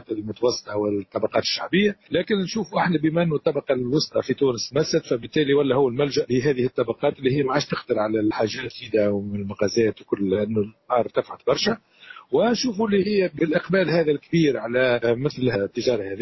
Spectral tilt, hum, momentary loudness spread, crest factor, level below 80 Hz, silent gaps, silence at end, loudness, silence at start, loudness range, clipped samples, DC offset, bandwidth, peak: -5.5 dB/octave; none; 5 LU; 14 dB; -56 dBFS; none; 0 s; -23 LUFS; 0.1 s; 2 LU; under 0.1%; under 0.1%; 6.2 kHz; -8 dBFS